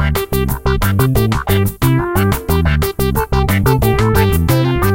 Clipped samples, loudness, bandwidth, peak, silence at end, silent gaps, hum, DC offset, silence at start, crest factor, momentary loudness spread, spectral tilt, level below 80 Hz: under 0.1%; -14 LUFS; 17 kHz; 0 dBFS; 0 s; none; none; under 0.1%; 0 s; 14 dB; 4 LU; -6 dB/octave; -22 dBFS